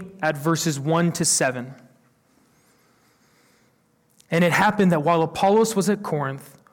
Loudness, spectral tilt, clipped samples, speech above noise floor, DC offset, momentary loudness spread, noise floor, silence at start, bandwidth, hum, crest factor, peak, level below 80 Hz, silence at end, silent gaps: -21 LUFS; -4.5 dB/octave; under 0.1%; 42 dB; under 0.1%; 9 LU; -63 dBFS; 0 s; 17.5 kHz; none; 14 dB; -8 dBFS; -62 dBFS; 0.3 s; none